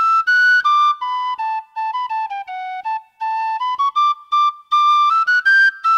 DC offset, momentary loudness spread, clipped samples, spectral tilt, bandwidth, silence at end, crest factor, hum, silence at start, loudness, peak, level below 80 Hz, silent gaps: under 0.1%; 13 LU; under 0.1%; 3.5 dB/octave; 11.5 kHz; 0 s; 10 dB; none; 0 s; -16 LUFS; -6 dBFS; -74 dBFS; none